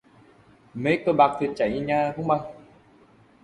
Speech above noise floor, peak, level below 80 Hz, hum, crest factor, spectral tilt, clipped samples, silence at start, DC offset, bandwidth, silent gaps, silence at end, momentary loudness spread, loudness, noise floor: 33 dB; -4 dBFS; -58 dBFS; none; 20 dB; -7.5 dB/octave; under 0.1%; 0.75 s; under 0.1%; 11 kHz; none; 0.85 s; 9 LU; -24 LUFS; -56 dBFS